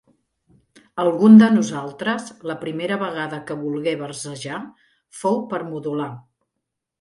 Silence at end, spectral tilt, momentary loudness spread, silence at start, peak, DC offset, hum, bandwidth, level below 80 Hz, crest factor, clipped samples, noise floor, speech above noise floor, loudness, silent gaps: 0.8 s; -6 dB/octave; 20 LU; 0.95 s; 0 dBFS; under 0.1%; none; 11.5 kHz; -66 dBFS; 20 dB; under 0.1%; -81 dBFS; 61 dB; -20 LUFS; none